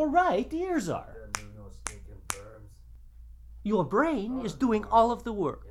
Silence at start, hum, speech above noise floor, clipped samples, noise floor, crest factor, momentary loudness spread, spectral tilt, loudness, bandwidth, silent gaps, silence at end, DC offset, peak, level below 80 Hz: 0 s; none; 23 dB; under 0.1%; -50 dBFS; 22 dB; 16 LU; -5.5 dB/octave; -29 LUFS; 14 kHz; none; 0 s; under 0.1%; -6 dBFS; -48 dBFS